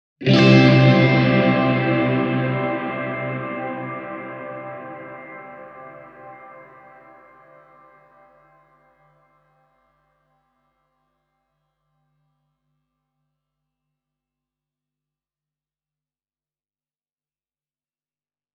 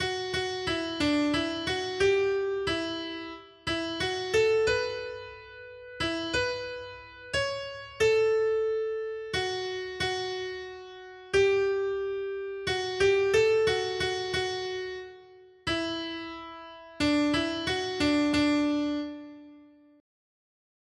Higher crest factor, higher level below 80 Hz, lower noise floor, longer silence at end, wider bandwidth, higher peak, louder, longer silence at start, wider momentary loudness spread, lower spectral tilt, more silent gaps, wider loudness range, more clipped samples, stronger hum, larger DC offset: first, 22 dB vs 16 dB; about the same, -56 dBFS vs -56 dBFS; first, under -90 dBFS vs -54 dBFS; first, 11.95 s vs 1.35 s; second, 6.8 kHz vs 12 kHz; first, -2 dBFS vs -14 dBFS; first, -17 LUFS vs -28 LUFS; first, 0.2 s vs 0 s; first, 27 LU vs 17 LU; first, -7.5 dB/octave vs -4 dB/octave; neither; first, 26 LU vs 4 LU; neither; neither; neither